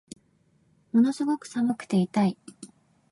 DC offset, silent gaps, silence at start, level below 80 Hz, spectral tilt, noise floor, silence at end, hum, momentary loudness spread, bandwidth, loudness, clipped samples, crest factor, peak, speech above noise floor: under 0.1%; none; 0.95 s; -72 dBFS; -7 dB/octave; -65 dBFS; 0.45 s; none; 8 LU; 11.5 kHz; -26 LUFS; under 0.1%; 16 dB; -12 dBFS; 41 dB